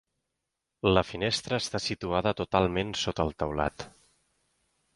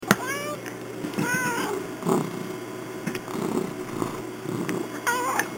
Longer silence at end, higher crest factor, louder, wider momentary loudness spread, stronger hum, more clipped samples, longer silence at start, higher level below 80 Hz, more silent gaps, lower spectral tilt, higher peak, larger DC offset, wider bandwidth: first, 1.05 s vs 0 s; about the same, 24 dB vs 28 dB; about the same, -29 LUFS vs -28 LUFS; second, 6 LU vs 10 LU; neither; neither; first, 0.85 s vs 0 s; first, -48 dBFS vs -60 dBFS; neither; about the same, -4.5 dB/octave vs -4.5 dB/octave; second, -6 dBFS vs 0 dBFS; neither; second, 11.5 kHz vs 17 kHz